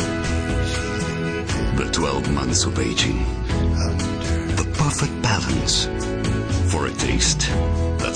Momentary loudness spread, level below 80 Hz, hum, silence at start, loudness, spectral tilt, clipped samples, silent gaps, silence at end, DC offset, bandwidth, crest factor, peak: 5 LU; -28 dBFS; none; 0 s; -21 LUFS; -4 dB/octave; under 0.1%; none; 0 s; under 0.1%; 10.5 kHz; 16 dB; -6 dBFS